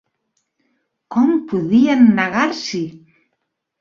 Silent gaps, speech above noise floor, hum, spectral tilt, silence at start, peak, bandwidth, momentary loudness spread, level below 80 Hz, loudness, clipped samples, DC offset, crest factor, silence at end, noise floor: none; 59 dB; none; -6 dB/octave; 1.1 s; -2 dBFS; 7.2 kHz; 12 LU; -60 dBFS; -16 LUFS; under 0.1%; under 0.1%; 16 dB; 0.85 s; -74 dBFS